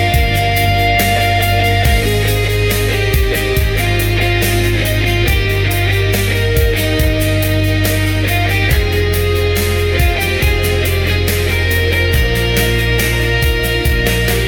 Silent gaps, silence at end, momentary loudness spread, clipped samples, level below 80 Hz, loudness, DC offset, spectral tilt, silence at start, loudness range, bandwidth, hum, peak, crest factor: none; 0 s; 2 LU; under 0.1%; -20 dBFS; -14 LUFS; under 0.1%; -4.5 dB/octave; 0 s; 1 LU; 19 kHz; none; 0 dBFS; 12 dB